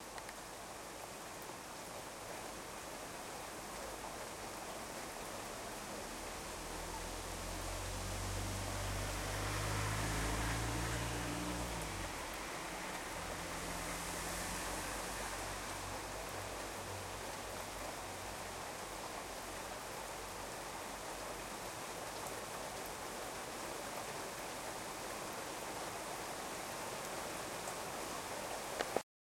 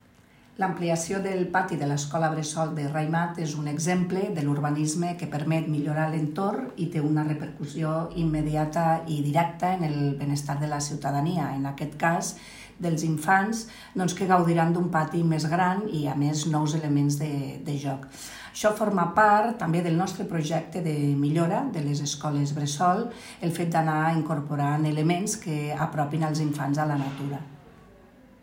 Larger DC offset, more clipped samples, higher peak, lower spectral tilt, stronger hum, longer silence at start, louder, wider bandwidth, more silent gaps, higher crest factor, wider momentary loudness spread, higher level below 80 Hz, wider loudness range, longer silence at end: neither; neither; second, -18 dBFS vs -8 dBFS; second, -3 dB/octave vs -6 dB/octave; neither; second, 0 s vs 0.6 s; second, -43 LUFS vs -26 LUFS; about the same, 16.5 kHz vs 16.5 kHz; neither; first, 26 dB vs 20 dB; about the same, 7 LU vs 8 LU; about the same, -54 dBFS vs -56 dBFS; first, 6 LU vs 3 LU; second, 0.3 s vs 0.7 s